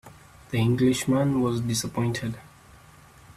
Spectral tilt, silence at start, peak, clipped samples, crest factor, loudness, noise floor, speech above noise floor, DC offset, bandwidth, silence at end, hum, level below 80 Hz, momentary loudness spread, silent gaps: -5.5 dB/octave; 0.05 s; -10 dBFS; under 0.1%; 16 dB; -25 LUFS; -51 dBFS; 27 dB; under 0.1%; 14.5 kHz; 0.05 s; none; -54 dBFS; 10 LU; none